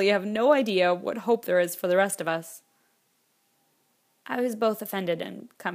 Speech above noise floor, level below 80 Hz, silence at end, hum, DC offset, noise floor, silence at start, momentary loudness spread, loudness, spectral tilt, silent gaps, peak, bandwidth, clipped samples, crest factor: 45 dB; -80 dBFS; 0 s; none; under 0.1%; -70 dBFS; 0 s; 11 LU; -26 LUFS; -4.5 dB/octave; none; -8 dBFS; 15.5 kHz; under 0.1%; 20 dB